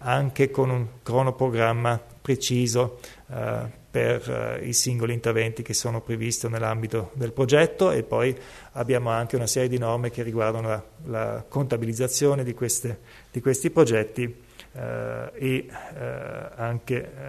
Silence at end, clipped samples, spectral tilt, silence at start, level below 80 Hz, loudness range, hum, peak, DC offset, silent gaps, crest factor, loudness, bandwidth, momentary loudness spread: 0 s; under 0.1%; -5 dB/octave; 0 s; -54 dBFS; 3 LU; none; -6 dBFS; under 0.1%; none; 20 dB; -25 LUFS; 13.5 kHz; 12 LU